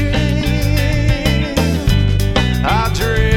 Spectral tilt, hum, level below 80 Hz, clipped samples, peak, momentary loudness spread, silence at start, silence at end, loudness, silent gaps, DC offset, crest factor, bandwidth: -5.5 dB/octave; none; -20 dBFS; under 0.1%; 0 dBFS; 1 LU; 0 s; 0 s; -15 LUFS; none; under 0.1%; 14 dB; 17.5 kHz